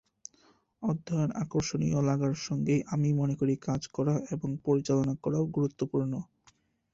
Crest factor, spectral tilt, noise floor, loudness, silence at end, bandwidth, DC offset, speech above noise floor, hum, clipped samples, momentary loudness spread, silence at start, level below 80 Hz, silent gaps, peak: 16 dB; -7 dB/octave; -66 dBFS; -30 LUFS; 0.7 s; 7.8 kHz; under 0.1%; 37 dB; none; under 0.1%; 7 LU; 0.8 s; -58 dBFS; none; -16 dBFS